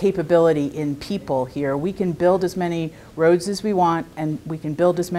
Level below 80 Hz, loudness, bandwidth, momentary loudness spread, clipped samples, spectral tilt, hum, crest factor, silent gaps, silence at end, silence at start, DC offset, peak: -52 dBFS; -21 LUFS; 15 kHz; 10 LU; under 0.1%; -6.5 dB/octave; none; 16 dB; none; 0 s; 0 s; under 0.1%; -4 dBFS